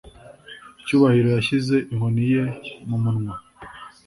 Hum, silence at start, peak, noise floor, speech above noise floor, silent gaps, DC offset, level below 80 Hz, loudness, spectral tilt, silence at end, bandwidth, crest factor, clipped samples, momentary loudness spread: none; 0.05 s; -4 dBFS; -44 dBFS; 24 dB; none; under 0.1%; -52 dBFS; -21 LUFS; -7.5 dB/octave; 0.2 s; 11.5 kHz; 18 dB; under 0.1%; 24 LU